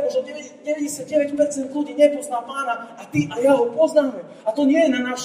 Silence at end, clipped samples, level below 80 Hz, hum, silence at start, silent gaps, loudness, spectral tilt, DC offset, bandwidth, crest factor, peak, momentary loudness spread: 0 s; under 0.1%; -64 dBFS; none; 0 s; none; -21 LUFS; -5 dB/octave; under 0.1%; 15 kHz; 18 dB; -4 dBFS; 10 LU